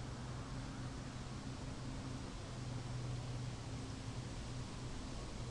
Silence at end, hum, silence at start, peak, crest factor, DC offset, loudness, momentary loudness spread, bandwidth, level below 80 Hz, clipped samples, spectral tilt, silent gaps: 0 s; none; 0 s; -34 dBFS; 12 dB; under 0.1%; -47 LUFS; 3 LU; 11.5 kHz; -52 dBFS; under 0.1%; -5.5 dB/octave; none